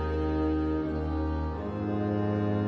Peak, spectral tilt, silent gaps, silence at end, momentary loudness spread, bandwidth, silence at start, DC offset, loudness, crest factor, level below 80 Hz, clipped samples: -18 dBFS; -10 dB/octave; none; 0 s; 4 LU; 6.2 kHz; 0 s; under 0.1%; -30 LUFS; 12 dB; -40 dBFS; under 0.1%